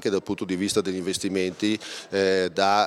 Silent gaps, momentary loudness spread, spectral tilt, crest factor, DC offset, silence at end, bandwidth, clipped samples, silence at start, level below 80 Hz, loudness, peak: none; 6 LU; -4 dB/octave; 20 dB; under 0.1%; 0 s; 15.5 kHz; under 0.1%; 0 s; -64 dBFS; -25 LUFS; -6 dBFS